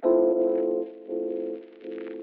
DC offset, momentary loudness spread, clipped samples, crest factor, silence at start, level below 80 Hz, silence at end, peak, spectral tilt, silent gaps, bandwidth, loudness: under 0.1%; 16 LU; under 0.1%; 16 dB; 0 s; -78 dBFS; 0 s; -10 dBFS; -7 dB/octave; none; 3.9 kHz; -27 LUFS